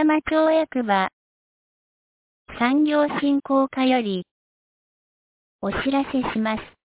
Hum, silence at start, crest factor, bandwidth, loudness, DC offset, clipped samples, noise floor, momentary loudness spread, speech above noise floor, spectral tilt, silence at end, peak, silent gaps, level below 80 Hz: none; 0 s; 16 dB; 4 kHz; -22 LUFS; under 0.1%; under 0.1%; under -90 dBFS; 9 LU; over 69 dB; -9.5 dB/octave; 0.25 s; -8 dBFS; 1.13-2.45 s, 4.31-5.59 s; -54 dBFS